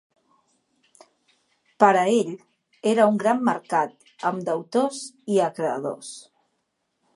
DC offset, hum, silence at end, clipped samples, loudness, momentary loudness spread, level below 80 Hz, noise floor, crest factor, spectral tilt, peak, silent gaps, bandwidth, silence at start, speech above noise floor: under 0.1%; none; 0.95 s; under 0.1%; -23 LUFS; 15 LU; -78 dBFS; -75 dBFS; 24 dB; -5 dB/octave; -2 dBFS; none; 11.5 kHz; 1.8 s; 53 dB